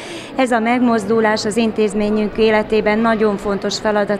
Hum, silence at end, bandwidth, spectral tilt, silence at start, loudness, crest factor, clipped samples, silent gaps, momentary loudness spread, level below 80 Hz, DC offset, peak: none; 0 s; 12.5 kHz; -5 dB/octave; 0 s; -16 LUFS; 14 dB; under 0.1%; none; 4 LU; -42 dBFS; under 0.1%; -2 dBFS